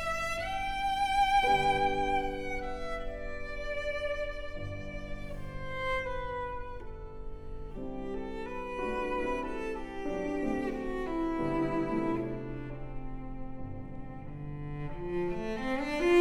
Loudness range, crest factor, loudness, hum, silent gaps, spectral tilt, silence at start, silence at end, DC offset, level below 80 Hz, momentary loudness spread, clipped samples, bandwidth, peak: 9 LU; 18 dB; -34 LUFS; none; none; -5.5 dB/octave; 0 s; 0 s; under 0.1%; -44 dBFS; 16 LU; under 0.1%; 14 kHz; -16 dBFS